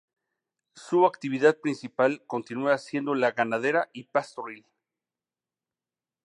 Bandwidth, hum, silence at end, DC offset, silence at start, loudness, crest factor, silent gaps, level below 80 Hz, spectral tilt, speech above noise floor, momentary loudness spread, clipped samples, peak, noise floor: 11 kHz; none; 1.65 s; under 0.1%; 0.75 s; -26 LUFS; 22 dB; none; -82 dBFS; -6 dB/octave; over 64 dB; 10 LU; under 0.1%; -8 dBFS; under -90 dBFS